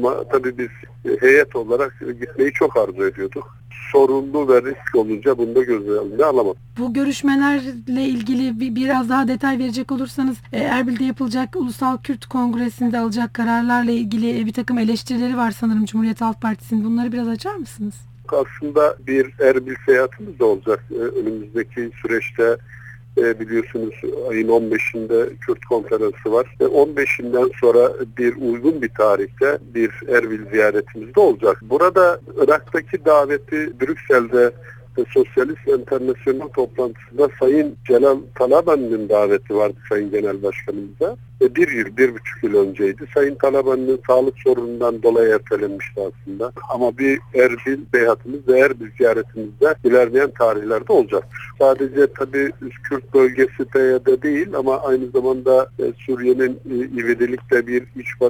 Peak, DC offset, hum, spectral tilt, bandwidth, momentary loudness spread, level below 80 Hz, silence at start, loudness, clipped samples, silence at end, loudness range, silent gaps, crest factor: 0 dBFS; under 0.1%; none; -6.5 dB/octave; 18 kHz; 9 LU; -52 dBFS; 0 s; -18 LUFS; under 0.1%; 0 s; 4 LU; none; 18 dB